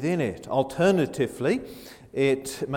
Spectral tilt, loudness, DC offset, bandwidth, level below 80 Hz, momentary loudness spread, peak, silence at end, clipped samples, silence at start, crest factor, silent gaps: -6 dB/octave; -25 LUFS; under 0.1%; 17.5 kHz; -56 dBFS; 12 LU; -10 dBFS; 0 s; under 0.1%; 0 s; 16 dB; none